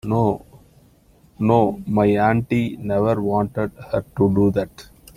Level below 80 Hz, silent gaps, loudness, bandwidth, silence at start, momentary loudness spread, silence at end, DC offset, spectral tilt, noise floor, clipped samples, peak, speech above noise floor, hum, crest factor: -46 dBFS; none; -20 LUFS; 15.5 kHz; 0.05 s; 9 LU; 0.35 s; under 0.1%; -9 dB/octave; -53 dBFS; under 0.1%; -2 dBFS; 34 dB; none; 18 dB